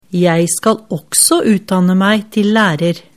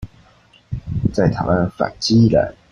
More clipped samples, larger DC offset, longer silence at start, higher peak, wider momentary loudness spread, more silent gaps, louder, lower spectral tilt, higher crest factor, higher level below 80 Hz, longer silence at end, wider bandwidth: neither; first, 0.3% vs under 0.1%; about the same, 0.1 s vs 0 s; first, 0 dBFS vs -4 dBFS; second, 6 LU vs 13 LU; neither; first, -13 LUFS vs -17 LUFS; second, -4 dB/octave vs -6.5 dB/octave; about the same, 14 dB vs 16 dB; second, -54 dBFS vs -38 dBFS; about the same, 0.15 s vs 0.2 s; first, 16 kHz vs 10 kHz